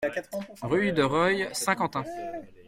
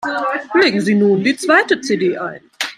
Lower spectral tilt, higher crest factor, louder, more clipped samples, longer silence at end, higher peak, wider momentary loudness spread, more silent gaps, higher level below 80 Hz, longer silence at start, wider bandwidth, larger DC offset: about the same, -4.5 dB/octave vs -4.5 dB/octave; about the same, 18 dB vs 14 dB; second, -27 LUFS vs -15 LUFS; neither; about the same, 0.05 s vs 0.05 s; second, -10 dBFS vs -2 dBFS; first, 13 LU vs 10 LU; neither; about the same, -60 dBFS vs -64 dBFS; about the same, 0 s vs 0 s; about the same, 16.5 kHz vs 15 kHz; neither